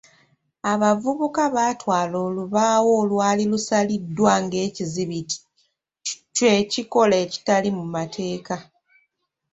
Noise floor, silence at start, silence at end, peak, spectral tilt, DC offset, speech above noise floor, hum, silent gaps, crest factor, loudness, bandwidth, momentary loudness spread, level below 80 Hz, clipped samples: -73 dBFS; 0.65 s; 0.9 s; -4 dBFS; -4.5 dB/octave; under 0.1%; 52 dB; none; none; 18 dB; -22 LUFS; 8.2 kHz; 11 LU; -62 dBFS; under 0.1%